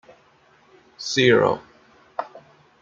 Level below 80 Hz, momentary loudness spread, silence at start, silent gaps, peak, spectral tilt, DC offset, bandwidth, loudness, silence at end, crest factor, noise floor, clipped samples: -64 dBFS; 18 LU; 1 s; none; -2 dBFS; -4.5 dB/octave; under 0.1%; 7.6 kHz; -21 LUFS; 0.45 s; 22 dB; -57 dBFS; under 0.1%